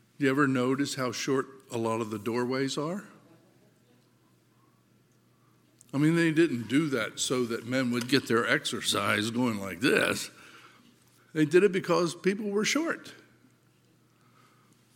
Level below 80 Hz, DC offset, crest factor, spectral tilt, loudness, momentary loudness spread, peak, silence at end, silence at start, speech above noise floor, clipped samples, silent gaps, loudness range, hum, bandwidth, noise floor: -76 dBFS; under 0.1%; 24 dB; -4.5 dB/octave; -28 LUFS; 9 LU; -6 dBFS; 1.8 s; 0.2 s; 37 dB; under 0.1%; none; 8 LU; none; 17 kHz; -65 dBFS